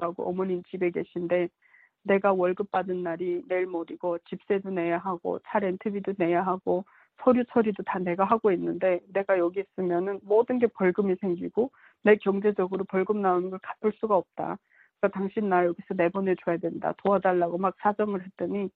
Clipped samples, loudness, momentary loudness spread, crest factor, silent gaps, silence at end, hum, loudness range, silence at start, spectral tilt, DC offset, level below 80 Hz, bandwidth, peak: under 0.1%; -27 LUFS; 8 LU; 20 dB; none; 0.05 s; none; 3 LU; 0 s; -10.5 dB/octave; under 0.1%; -70 dBFS; 4.3 kHz; -8 dBFS